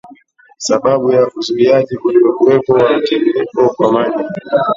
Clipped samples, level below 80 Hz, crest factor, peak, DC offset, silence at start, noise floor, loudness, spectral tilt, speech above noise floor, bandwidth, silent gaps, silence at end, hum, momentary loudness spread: under 0.1%; -54 dBFS; 12 dB; 0 dBFS; under 0.1%; 0.05 s; -43 dBFS; -13 LUFS; -5.5 dB/octave; 32 dB; 7.8 kHz; none; 0 s; none; 6 LU